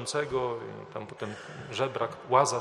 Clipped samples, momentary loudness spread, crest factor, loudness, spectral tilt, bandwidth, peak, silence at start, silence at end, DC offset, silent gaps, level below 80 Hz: under 0.1%; 15 LU; 22 dB; -31 LUFS; -4 dB/octave; 13 kHz; -8 dBFS; 0 s; 0 s; under 0.1%; none; -66 dBFS